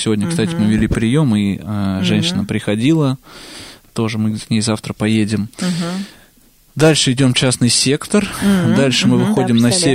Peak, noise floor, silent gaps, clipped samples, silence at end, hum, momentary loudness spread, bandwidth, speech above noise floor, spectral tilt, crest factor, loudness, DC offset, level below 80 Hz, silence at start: -2 dBFS; -50 dBFS; none; under 0.1%; 0 s; none; 10 LU; 16 kHz; 35 dB; -5 dB/octave; 14 dB; -15 LUFS; under 0.1%; -38 dBFS; 0 s